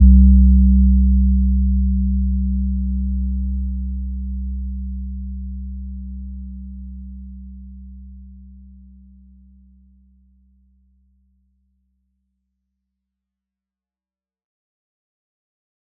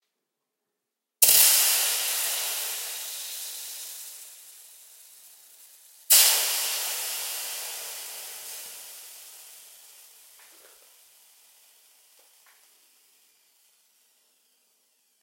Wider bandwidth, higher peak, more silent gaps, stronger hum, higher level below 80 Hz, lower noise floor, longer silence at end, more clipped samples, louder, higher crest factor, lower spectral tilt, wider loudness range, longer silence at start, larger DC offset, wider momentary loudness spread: second, 0.4 kHz vs 16.5 kHz; about the same, -2 dBFS vs -2 dBFS; neither; neither; first, -20 dBFS vs -76 dBFS; first, under -90 dBFS vs -84 dBFS; first, 7.5 s vs 5.45 s; neither; first, -18 LUFS vs -22 LUFS; second, 18 dB vs 28 dB; first, -20 dB/octave vs 4 dB/octave; first, 24 LU vs 19 LU; second, 0 s vs 1.2 s; neither; second, 24 LU vs 27 LU